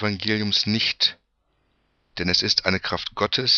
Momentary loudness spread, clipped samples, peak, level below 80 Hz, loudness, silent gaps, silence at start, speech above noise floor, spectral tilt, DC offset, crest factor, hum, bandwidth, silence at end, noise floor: 8 LU; under 0.1%; -4 dBFS; -52 dBFS; -21 LUFS; none; 0 s; 47 dB; -3.5 dB/octave; under 0.1%; 20 dB; none; 7.2 kHz; 0 s; -69 dBFS